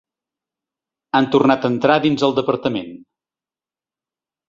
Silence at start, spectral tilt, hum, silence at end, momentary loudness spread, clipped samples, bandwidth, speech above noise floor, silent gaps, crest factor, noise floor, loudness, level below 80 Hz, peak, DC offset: 1.15 s; -6.5 dB/octave; none; 1.5 s; 9 LU; under 0.1%; 7.6 kHz; over 73 dB; none; 18 dB; under -90 dBFS; -17 LUFS; -60 dBFS; -2 dBFS; under 0.1%